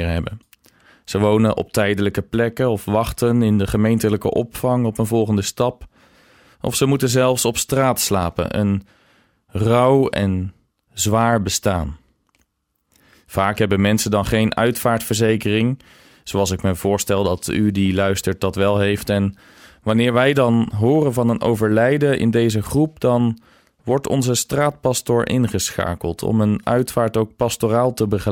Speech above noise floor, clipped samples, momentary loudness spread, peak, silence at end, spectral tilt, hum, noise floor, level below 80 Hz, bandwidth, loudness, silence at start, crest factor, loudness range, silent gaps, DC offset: 53 dB; under 0.1%; 7 LU; -4 dBFS; 0 s; -5.5 dB/octave; none; -71 dBFS; -44 dBFS; 17.5 kHz; -19 LUFS; 0 s; 16 dB; 3 LU; none; under 0.1%